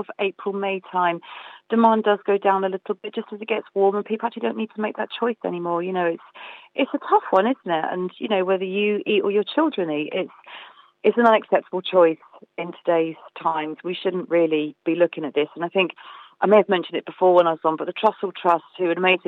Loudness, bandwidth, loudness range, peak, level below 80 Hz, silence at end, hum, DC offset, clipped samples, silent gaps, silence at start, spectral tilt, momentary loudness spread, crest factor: -22 LUFS; 4.5 kHz; 4 LU; -4 dBFS; -84 dBFS; 0.1 s; none; under 0.1%; under 0.1%; none; 0 s; -8 dB/octave; 13 LU; 18 dB